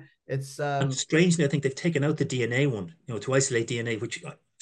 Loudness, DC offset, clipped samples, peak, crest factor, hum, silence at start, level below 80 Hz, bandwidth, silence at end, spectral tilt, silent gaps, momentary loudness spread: -27 LUFS; under 0.1%; under 0.1%; -8 dBFS; 18 dB; none; 0 s; -68 dBFS; 12 kHz; 0.25 s; -5 dB/octave; none; 13 LU